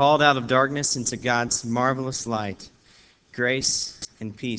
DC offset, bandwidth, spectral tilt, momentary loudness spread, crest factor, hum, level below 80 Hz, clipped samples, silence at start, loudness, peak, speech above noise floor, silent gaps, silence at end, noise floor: under 0.1%; 8 kHz; -3 dB/octave; 16 LU; 20 dB; none; -56 dBFS; under 0.1%; 0 s; -23 LUFS; -4 dBFS; 32 dB; none; 0 s; -56 dBFS